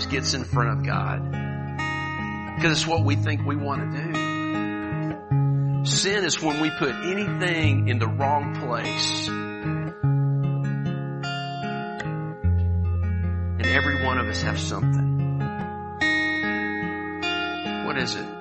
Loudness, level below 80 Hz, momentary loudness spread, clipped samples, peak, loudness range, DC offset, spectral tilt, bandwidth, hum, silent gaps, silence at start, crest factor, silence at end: -25 LUFS; -42 dBFS; 8 LU; under 0.1%; -6 dBFS; 3 LU; under 0.1%; -5 dB/octave; 8.4 kHz; none; none; 0 s; 20 dB; 0 s